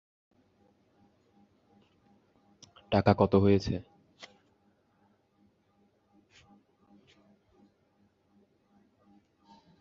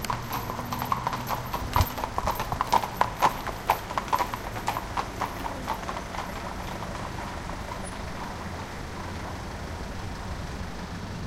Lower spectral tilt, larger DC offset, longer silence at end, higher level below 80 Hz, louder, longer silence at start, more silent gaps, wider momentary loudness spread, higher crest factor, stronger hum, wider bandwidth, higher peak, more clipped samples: first, -7 dB/octave vs -4.5 dB/octave; neither; first, 6 s vs 0 s; second, -54 dBFS vs -40 dBFS; first, -27 LUFS vs -31 LUFS; first, 2.9 s vs 0 s; neither; first, 29 LU vs 10 LU; about the same, 28 dB vs 26 dB; neither; second, 7.2 kHz vs 17 kHz; about the same, -6 dBFS vs -4 dBFS; neither